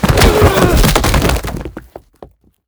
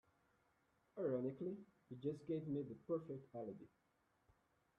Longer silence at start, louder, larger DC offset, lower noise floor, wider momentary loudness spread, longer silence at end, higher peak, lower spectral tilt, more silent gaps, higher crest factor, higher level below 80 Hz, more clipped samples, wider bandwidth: second, 0 s vs 0.95 s; first, -11 LUFS vs -47 LUFS; neither; second, -40 dBFS vs -81 dBFS; about the same, 16 LU vs 16 LU; second, 0.4 s vs 1.1 s; first, 0 dBFS vs -32 dBFS; second, -5 dB/octave vs -9.5 dB/octave; neither; second, 12 dB vs 18 dB; first, -18 dBFS vs -84 dBFS; first, 0.3% vs under 0.1%; first, over 20 kHz vs 7 kHz